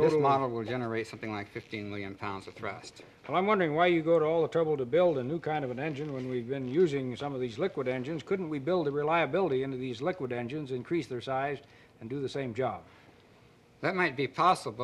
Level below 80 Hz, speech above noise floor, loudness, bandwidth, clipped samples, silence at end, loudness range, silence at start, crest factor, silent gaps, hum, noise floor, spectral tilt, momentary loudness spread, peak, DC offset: -68 dBFS; 29 dB; -31 LUFS; 12 kHz; under 0.1%; 0 s; 7 LU; 0 s; 20 dB; none; none; -59 dBFS; -6.5 dB/octave; 13 LU; -12 dBFS; under 0.1%